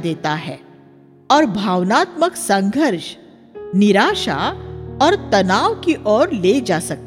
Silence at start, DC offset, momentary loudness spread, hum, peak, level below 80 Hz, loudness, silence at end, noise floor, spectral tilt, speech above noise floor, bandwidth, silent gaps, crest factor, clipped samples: 0 s; under 0.1%; 12 LU; none; 0 dBFS; -46 dBFS; -17 LUFS; 0 s; -46 dBFS; -5 dB/octave; 30 dB; 16 kHz; none; 16 dB; under 0.1%